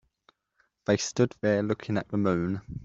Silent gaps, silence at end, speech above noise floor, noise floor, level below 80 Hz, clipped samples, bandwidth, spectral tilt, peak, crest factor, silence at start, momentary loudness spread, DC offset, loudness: none; 0 s; 45 dB; -72 dBFS; -58 dBFS; under 0.1%; 7.8 kHz; -5.5 dB/octave; -10 dBFS; 20 dB; 0.9 s; 5 LU; under 0.1%; -28 LUFS